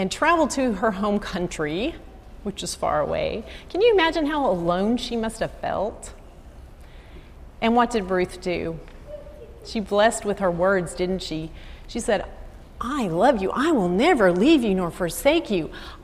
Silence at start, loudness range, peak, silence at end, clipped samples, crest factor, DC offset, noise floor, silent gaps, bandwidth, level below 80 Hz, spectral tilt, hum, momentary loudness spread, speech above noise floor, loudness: 0 s; 6 LU; -6 dBFS; 0 s; under 0.1%; 16 dB; under 0.1%; -43 dBFS; none; 15 kHz; -42 dBFS; -5 dB/octave; none; 16 LU; 21 dB; -23 LUFS